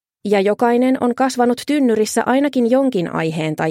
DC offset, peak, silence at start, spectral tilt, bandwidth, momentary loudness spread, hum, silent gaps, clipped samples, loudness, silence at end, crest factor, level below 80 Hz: under 0.1%; -2 dBFS; 0.25 s; -5.5 dB/octave; 16 kHz; 5 LU; none; none; under 0.1%; -17 LUFS; 0 s; 14 dB; -64 dBFS